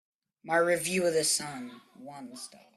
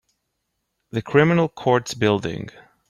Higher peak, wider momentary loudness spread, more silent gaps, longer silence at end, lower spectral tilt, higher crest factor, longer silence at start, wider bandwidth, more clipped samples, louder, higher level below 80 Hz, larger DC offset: second, -12 dBFS vs -2 dBFS; first, 20 LU vs 14 LU; neither; second, 0.2 s vs 0.4 s; second, -2.5 dB/octave vs -6 dB/octave; about the same, 18 dB vs 20 dB; second, 0.45 s vs 0.95 s; first, 15.5 kHz vs 13 kHz; neither; second, -28 LUFS vs -20 LUFS; second, -74 dBFS vs -56 dBFS; neither